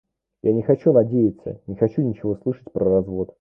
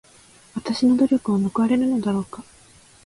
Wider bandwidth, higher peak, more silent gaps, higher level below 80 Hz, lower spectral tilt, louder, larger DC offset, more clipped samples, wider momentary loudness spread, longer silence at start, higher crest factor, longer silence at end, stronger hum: second, 3.1 kHz vs 11.5 kHz; first, -4 dBFS vs -8 dBFS; neither; first, -50 dBFS vs -58 dBFS; first, -12.5 dB/octave vs -6.5 dB/octave; about the same, -21 LUFS vs -21 LUFS; neither; neither; second, 10 LU vs 17 LU; about the same, 0.45 s vs 0.55 s; about the same, 18 dB vs 14 dB; second, 0.15 s vs 0.65 s; neither